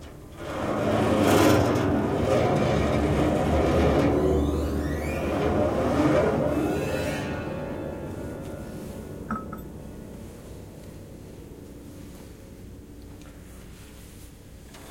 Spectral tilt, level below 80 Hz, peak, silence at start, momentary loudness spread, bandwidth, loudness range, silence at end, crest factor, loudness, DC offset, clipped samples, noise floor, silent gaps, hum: -6.5 dB/octave; -40 dBFS; -6 dBFS; 0 s; 23 LU; 16.5 kHz; 21 LU; 0 s; 20 dB; -25 LUFS; under 0.1%; under 0.1%; -45 dBFS; none; none